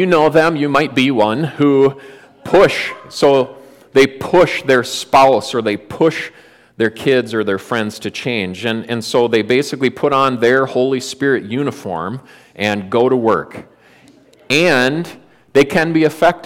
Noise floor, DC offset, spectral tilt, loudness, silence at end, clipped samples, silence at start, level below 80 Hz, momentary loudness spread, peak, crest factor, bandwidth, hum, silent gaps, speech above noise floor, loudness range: -47 dBFS; under 0.1%; -5 dB/octave; -15 LUFS; 0 s; under 0.1%; 0 s; -52 dBFS; 11 LU; -2 dBFS; 14 dB; 16.5 kHz; none; none; 32 dB; 4 LU